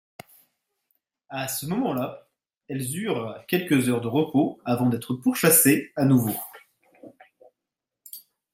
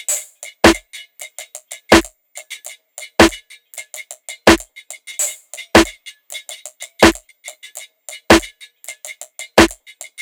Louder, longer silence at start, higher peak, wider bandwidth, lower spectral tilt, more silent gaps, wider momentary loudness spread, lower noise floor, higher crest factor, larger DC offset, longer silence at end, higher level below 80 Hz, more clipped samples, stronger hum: second, -23 LUFS vs -14 LUFS; first, 1.3 s vs 0.1 s; second, -6 dBFS vs 0 dBFS; second, 16.5 kHz vs 19.5 kHz; first, -4.5 dB/octave vs -3 dB/octave; neither; second, 19 LU vs 22 LU; first, -87 dBFS vs -38 dBFS; about the same, 20 dB vs 18 dB; neither; second, 0.35 s vs 0.5 s; second, -68 dBFS vs -36 dBFS; neither; neither